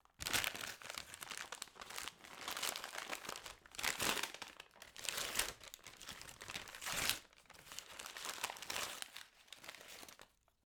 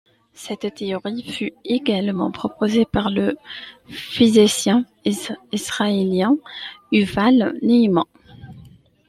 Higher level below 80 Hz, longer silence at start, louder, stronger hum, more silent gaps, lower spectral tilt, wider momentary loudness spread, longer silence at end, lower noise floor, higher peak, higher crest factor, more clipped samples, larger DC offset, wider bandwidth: second, -70 dBFS vs -50 dBFS; second, 0.2 s vs 0.4 s; second, -43 LUFS vs -19 LUFS; neither; neither; second, 0 dB/octave vs -5 dB/octave; about the same, 16 LU vs 16 LU; about the same, 0.4 s vs 0.4 s; first, -67 dBFS vs -47 dBFS; second, -14 dBFS vs -2 dBFS; first, 32 dB vs 18 dB; neither; neither; first, over 20 kHz vs 14.5 kHz